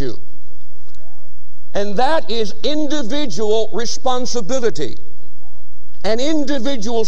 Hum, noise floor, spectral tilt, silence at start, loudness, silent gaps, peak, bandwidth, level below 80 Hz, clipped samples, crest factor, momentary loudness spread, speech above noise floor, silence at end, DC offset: 60 Hz at -50 dBFS; -40 dBFS; -4.5 dB/octave; 0 s; -21 LUFS; none; -2 dBFS; 12.5 kHz; -46 dBFS; under 0.1%; 16 dB; 9 LU; 20 dB; 0 s; 40%